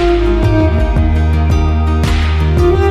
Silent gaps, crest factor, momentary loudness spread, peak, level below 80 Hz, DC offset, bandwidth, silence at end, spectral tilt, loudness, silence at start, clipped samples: none; 10 dB; 2 LU; 0 dBFS; -14 dBFS; under 0.1%; 10 kHz; 0 s; -7.5 dB/octave; -13 LUFS; 0 s; under 0.1%